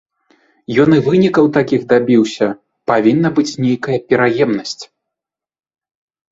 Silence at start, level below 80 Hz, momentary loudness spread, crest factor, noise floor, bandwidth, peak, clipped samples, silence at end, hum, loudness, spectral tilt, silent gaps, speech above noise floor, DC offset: 0.7 s; -54 dBFS; 8 LU; 16 dB; -85 dBFS; 7.8 kHz; 0 dBFS; under 0.1%; 1.45 s; none; -14 LUFS; -6.5 dB/octave; none; 72 dB; under 0.1%